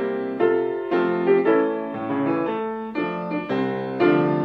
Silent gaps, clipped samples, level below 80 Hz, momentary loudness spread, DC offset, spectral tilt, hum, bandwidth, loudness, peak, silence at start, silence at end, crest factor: none; under 0.1%; -64 dBFS; 8 LU; under 0.1%; -9 dB/octave; none; 5.2 kHz; -22 LUFS; -6 dBFS; 0 s; 0 s; 16 dB